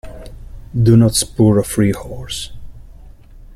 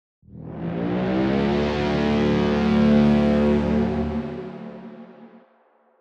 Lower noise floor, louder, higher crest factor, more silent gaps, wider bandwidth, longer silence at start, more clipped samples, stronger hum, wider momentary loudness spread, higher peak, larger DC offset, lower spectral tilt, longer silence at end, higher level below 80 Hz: second, -38 dBFS vs -60 dBFS; first, -15 LUFS vs -21 LUFS; about the same, 16 dB vs 16 dB; neither; first, 14.5 kHz vs 7.2 kHz; second, 0.05 s vs 0.35 s; neither; neither; about the same, 19 LU vs 20 LU; first, -2 dBFS vs -6 dBFS; neither; second, -6 dB/octave vs -8 dB/octave; second, 0.15 s vs 0.75 s; first, -34 dBFS vs -40 dBFS